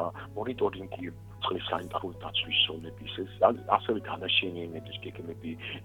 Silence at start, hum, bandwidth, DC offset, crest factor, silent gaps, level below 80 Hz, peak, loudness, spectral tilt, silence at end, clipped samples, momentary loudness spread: 0 s; 50 Hz at -45 dBFS; 19 kHz; under 0.1%; 24 dB; none; -58 dBFS; -8 dBFS; -31 LUFS; -6 dB/octave; 0 s; under 0.1%; 14 LU